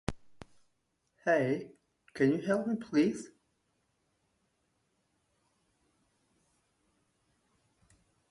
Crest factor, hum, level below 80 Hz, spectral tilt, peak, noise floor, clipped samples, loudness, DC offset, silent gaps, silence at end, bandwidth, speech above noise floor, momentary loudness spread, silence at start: 22 dB; none; -64 dBFS; -6.5 dB/octave; -14 dBFS; -79 dBFS; under 0.1%; -31 LUFS; under 0.1%; none; 5.05 s; 11.5 kHz; 49 dB; 20 LU; 0.1 s